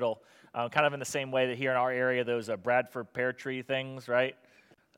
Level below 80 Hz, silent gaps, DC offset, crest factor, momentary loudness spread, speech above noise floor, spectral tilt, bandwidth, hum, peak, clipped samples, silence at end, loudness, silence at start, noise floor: -80 dBFS; none; under 0.1%; 22 dB; 8 LU; 32 dB; -4.5 dB/octave; 16.5 kHz; none; -10 dBFS; under 0.1%; 0.65 s; -31 LUFS; 0 s; -63 dBFS